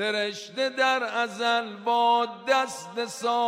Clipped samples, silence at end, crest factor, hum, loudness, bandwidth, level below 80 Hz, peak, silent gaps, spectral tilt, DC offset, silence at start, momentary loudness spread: under 0.1%; 0 s; 16 dB; none; -26 LUFS; 16 kHz; under -90 dBFS; -10 dBFS; none; -2 dB/octave; under 0.1%; 0 s; 8 LU